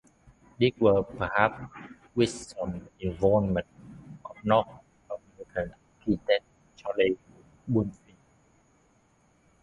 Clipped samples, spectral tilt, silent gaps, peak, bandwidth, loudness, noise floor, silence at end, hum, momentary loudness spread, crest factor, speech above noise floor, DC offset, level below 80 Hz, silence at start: under 0.1%; -6.5 dB/octave; none; -4 dBFS; 11.5 kHz; -28 LUFS; -65 dBFS; 1.7 s; none; 20 LU; 24 dB; 39 dB; under 0.1%; -52 dBFS; 0.6 s